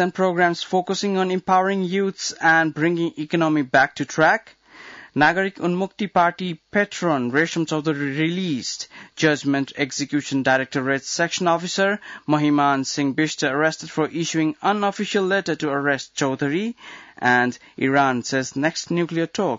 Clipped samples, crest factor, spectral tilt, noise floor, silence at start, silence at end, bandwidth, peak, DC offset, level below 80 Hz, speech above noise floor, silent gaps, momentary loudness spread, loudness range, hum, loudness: under 0.1%; 16 dB; -4.5 dB/octave; -43 dBFS; 0 s; 0 s; 7.8 kHz; -4 dBFS; under 0.1%; -66 dBFS; 22 dB; none; 7 LU; 3 LU; none; -21 LUFS